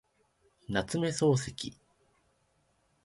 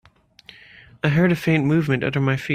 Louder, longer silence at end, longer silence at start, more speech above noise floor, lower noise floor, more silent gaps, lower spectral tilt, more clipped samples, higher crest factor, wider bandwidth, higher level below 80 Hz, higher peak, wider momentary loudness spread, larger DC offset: second, -31 LUFS vs -20 LUFS; first, 1.35 s vs 0 s; second, 0.7 s vs 1.05 s; first, 42 dB vs 30 dB; first, -72 dBFS vs -50 dBFS; neither; second, -5 dB/octave vs -7.5 dB/octave; neither; about the same, 20 dB vs 16 dB; second, 11.5 kHz vs 15 kHz; second, -60 dBFS vs -54 dBFS; second, -14 dBFS vs -4 dBFS; first, 13 LU vs 4 LU; neither